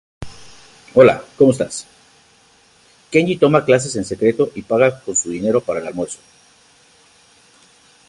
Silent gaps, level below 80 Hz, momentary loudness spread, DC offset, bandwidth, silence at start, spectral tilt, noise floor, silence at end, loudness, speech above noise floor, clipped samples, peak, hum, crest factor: none; -52 dBFS; 16 LU; under 0.1%; 11.5 kHz; 0.2 s; -5 dB/octave; -52 dBFS; 1.95 s; -17 LUFS; 37 dB; under 0.1%; 0 dBFS; none; 18 dB